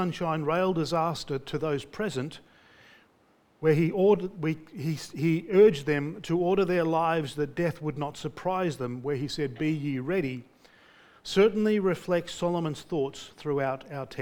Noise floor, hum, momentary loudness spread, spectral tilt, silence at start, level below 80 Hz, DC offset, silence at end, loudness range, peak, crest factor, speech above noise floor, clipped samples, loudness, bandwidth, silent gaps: -64 dBFS; none; 11 LU; -6.5 dB/octave; 0 s; -58 dBFS; under 0.1%; 0 s; 5 LU; -10 dBFS; 18 dB; 37 dB; under 0.1%; -28 LUFS; 18 kHz; none